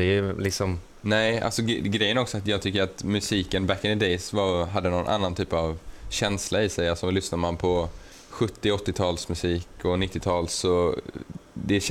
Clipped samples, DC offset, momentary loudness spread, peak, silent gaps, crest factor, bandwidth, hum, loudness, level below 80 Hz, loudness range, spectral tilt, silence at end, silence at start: under 0.1%; under 0.1%; 7 LU; -10 dBFS; none; 16 dB; 15.5 kHz; none; -26 LUFS; -44 dBFS; 2 LU; -4.5 dB/octave; 0 s; 0 s